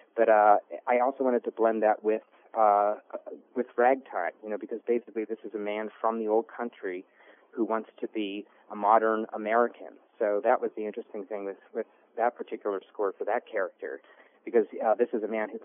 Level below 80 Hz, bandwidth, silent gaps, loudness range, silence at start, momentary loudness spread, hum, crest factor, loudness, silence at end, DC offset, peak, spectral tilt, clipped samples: under -90 dBFS; 3.6 kHz; none; 6 LU; 0.15 s; 14 LU; none; 22 dB; -28 LUFS; 0 s; under 0.1%; -8 dBFS; 1 dB/octave; under 0.1%